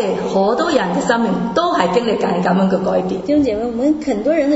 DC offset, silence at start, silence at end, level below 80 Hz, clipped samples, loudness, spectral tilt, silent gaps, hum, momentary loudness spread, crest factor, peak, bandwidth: under 0.1%; 0 s; 0 s; -46 dBFS; under 0.1%; -16 LUFS; -6 dB/octave; none; none; 3 LU; 16 dB; 0 dBFS; 8 kHz